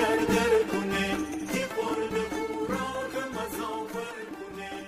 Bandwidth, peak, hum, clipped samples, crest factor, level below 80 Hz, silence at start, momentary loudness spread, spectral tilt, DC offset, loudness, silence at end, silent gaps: 16 kHz; -14 dBFS; none; under 0.1%; 16 dB; -52 dBFS; 0 s; 13 LU; -4.5 dB/octave; under 0.1%; -30 LUFS; 0 s; none